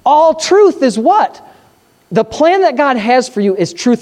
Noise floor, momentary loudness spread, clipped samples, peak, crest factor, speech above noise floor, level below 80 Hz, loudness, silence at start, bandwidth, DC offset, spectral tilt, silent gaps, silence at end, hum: -50 dBFS; 7 LU; under 0.1%; 0 dBFS; 10 dB; 39 dB; -52 dBFS; -11 LUFS; 0.05 s; 11 kHz; under 0.1%; -4.5 dB/octave; none; 0 s; none